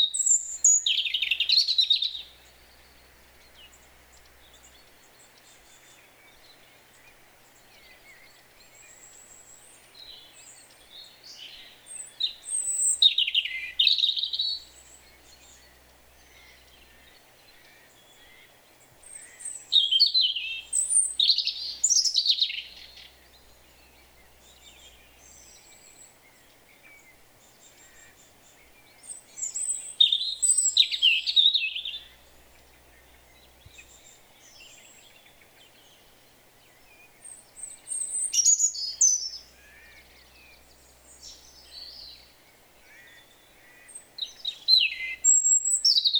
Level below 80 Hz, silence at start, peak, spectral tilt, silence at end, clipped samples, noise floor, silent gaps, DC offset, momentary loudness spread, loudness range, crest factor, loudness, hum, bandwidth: -66 dBFS; 0 s; -6 dBFS; 4.5 dB/octave; 0 s; under 0.1%; -57 dBFS; none; under 0.1%; 26 LU; 24 LU; 22 dB; -22 LUFS; none; over 20 kHz